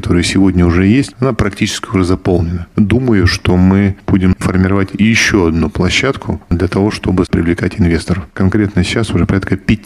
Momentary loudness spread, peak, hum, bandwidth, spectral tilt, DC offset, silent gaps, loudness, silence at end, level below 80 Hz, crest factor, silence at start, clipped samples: 5 LU; 0 dBFS; none; 12.5 kHz; -6 dB/octave; under 0.1%; none; -13 LUFS; 0.05 s; -28 dBFS; 12 dB; 0 s; under 0.1%